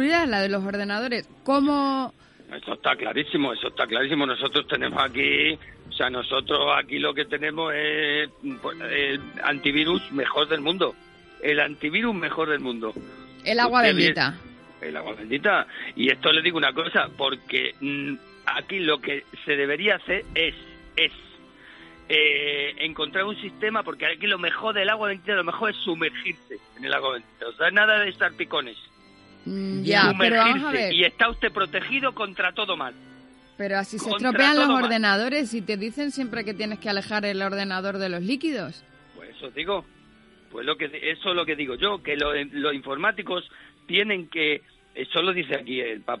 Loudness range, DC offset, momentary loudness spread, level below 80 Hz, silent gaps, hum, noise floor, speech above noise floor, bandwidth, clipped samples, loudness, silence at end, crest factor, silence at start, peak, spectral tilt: 5 LU; under 0.1%; 13 LU; -56 dBFS; none; none; -54 dBFS; 30 dB; 11.5 kHz; under 0.1%; -23 LUFS; 0 s; 22 dB; 0 s; -4 dBFS; -4.5 dB/octave